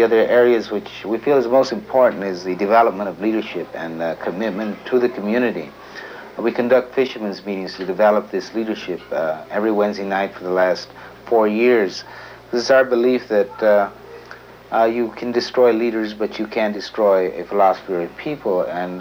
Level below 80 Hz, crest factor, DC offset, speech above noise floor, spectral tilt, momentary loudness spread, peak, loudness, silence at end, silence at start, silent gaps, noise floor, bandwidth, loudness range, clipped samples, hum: -58 dBFS; 16 dB; under 0.1%; 22 dB; -5.5 dB/octave; 12 LU; -2 dBFS; -19 LUFS; 0 s; 0 s; none; -40 dBFS; 16.5 kHz; 4 LU; under 0.1%; none